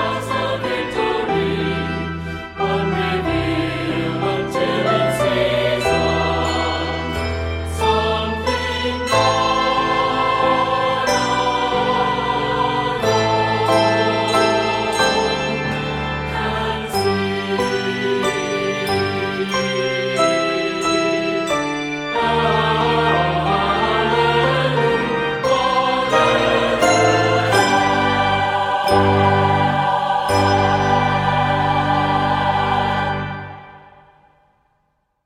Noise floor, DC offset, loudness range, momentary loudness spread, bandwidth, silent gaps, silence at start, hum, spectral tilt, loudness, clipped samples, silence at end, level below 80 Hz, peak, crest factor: -67 dBFS; under 0.1%; 5 LU; 6 LU; 16 kHz; none; 0 s; none; -5 dB/octave; -18 LUFS; under 0.1%; 1.45 s; -38 dBFS; -2 dBFS; 16 dB